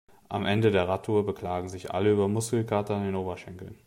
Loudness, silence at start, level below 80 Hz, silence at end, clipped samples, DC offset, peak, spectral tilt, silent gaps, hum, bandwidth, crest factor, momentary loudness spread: -28 LUFS; 0.3 s; -62 dBFS; 0.1 s; under 0.1%; under 0.1%; -12 dBFS; -6 dB/octave; none; none; 16 kHz; 16 dB; 11 LU